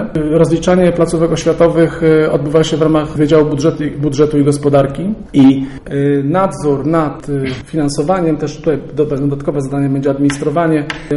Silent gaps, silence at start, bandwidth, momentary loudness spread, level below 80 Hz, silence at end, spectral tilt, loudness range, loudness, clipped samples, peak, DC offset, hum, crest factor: none; 0 s; 11.5 kHz; 7 LU; -36 dBFS; 0 s; -7 dB/octave; 4 LU; -13 LUFS; under 0.1%; 0 dBFS; under 0.1%; none; 12 dB